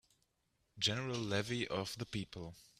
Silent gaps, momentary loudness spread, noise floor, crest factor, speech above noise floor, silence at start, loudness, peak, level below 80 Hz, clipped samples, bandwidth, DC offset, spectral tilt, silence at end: none; 9 LU; -81 dBFS; 22 dB; 41 dB; 0.75 s; -39 LUFS; -20 dBFS; -68 dBFS; under 0.1%; 15 kHz; under 0.1%; -4 dB/octave; 0.15 s